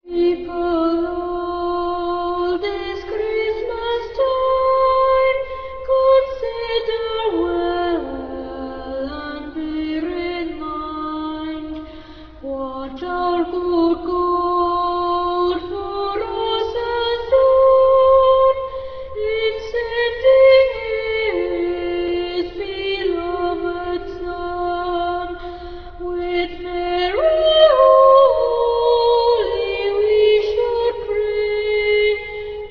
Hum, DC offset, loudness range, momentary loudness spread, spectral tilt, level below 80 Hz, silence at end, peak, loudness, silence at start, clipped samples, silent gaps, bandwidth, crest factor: none; under 0.1%; 10 LU; 15 LU; -6.5 dB/octave; -40 dBFS; 0 s; -2 dBFS; -18 LUFS; 0.05 s; under 0.1%; none; 5.4 kHz; 16 dB